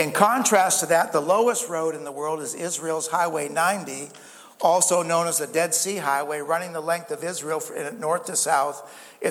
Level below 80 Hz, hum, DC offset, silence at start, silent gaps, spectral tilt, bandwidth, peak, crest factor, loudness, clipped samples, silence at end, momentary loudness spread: -78 dBFS; none; under 0.1%; 0 s; none; -2.5 dB/octave; 18 kHz; -2 dBFS; 22 dB; -23 LUFS; under 0.1%; 0 s; 11 LU